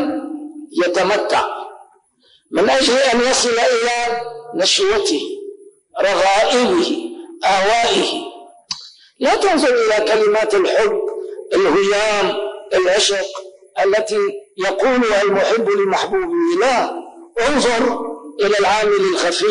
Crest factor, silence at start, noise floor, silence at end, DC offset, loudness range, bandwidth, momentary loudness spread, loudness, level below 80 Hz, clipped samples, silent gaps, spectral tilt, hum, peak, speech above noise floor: 12 dB; 0 s; -56 dBFS; 0 s; under 0.1%; 2 LU; 10.5 kHz; 14 LU; -16 LUFS; -50 dBFS; under 0.1%; none; -2.5 dB/octave; none; -6 dBFS; 40 dB